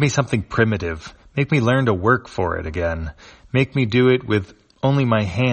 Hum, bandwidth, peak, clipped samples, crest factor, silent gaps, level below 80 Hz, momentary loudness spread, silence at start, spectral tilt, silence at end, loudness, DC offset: none; 8.8 kHz; 0 dBFS; under 0.1%; 18 dB; none; -40 dBFS; 12 LU; 0 s; -6.5 dB/octave; 0 s; -20 LUFS; under 0.1%